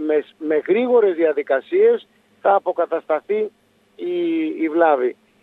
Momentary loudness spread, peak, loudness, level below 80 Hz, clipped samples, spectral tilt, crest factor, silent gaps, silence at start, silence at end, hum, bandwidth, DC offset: 8 LU; -2 dBFS; -19 LUFS; -80 dBFS; under 0.1%; -7.5 dB/octave; 16 dB; none; 0 s; 0.3 s; none; 4.1 kHz; under 0.1%